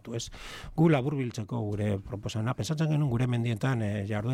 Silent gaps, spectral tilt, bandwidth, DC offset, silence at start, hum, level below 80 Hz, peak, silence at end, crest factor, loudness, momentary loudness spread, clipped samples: none; -7 dB/octave; 13.5 kHz; under 0.1%; 0.05 s; none; -52 dBFS; -14 dBFS; 0 s; 16 dB; -30 LUFS; 12 LU; under 0.1%